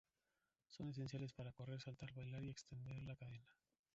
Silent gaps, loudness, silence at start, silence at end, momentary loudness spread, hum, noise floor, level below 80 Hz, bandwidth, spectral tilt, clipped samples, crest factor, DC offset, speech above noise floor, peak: none; -53 LUFS; 0.7 s; 0.4 s; 7 LU; none; under -90 dBFS; -74 dBFS; 7.6 kHz; -6.5 dB/octave; under 0.1%; 16 dB; under 0.1%; over 38 dB; -38 dBFS